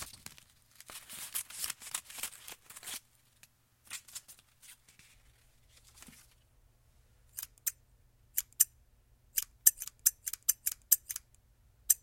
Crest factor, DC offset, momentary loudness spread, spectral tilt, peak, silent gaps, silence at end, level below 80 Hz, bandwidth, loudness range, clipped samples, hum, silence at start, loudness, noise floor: 34 dB; under 0.1%; 26 LU; 2 dB/octave; -4 dBFS; none; 0.05 s; -68 dBFS; 17 kHz; 21 LU; under 0.1%; none; 0 s; -33 LUFS; -66 dBFS